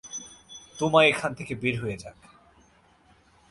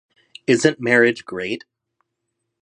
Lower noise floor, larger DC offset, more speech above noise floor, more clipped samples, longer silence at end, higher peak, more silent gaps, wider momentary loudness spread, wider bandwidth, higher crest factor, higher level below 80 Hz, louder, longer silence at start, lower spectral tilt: second, -60 dBFS vs -77 dBFS; neither; second, 35 dB vs 59 dB; neither; first, 1.4 s vs 1.05 s; second, -6 dBFS vs -2 dBFS; neither; first, 24 LU vs 13 LU; about the same, 11.5 kHz vs 10.5 kHz; about the same, 24 dB vs 20 dB; first, -58 dBFS vs -66 dBFS; second, -24 LUFS vs -19 LUFS; second, 0.05 s vs 0.5 s; about the same, -4 dB/octave vs -4.5 dB/octave